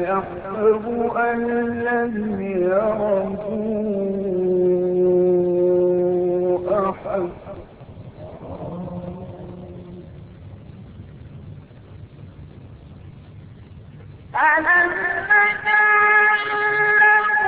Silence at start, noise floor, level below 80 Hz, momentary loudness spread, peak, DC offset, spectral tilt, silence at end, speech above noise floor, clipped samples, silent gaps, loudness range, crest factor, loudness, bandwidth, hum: 0 s; -41 dBFS; -50 dBFS; 24 LU; -4 dBFS; under 0.1%; -10.5 dB/octave; 0 s; 22 dB; under 0.1%; none; 24 LU; 16 dB; -18 LUFS; 4.5 kHz; none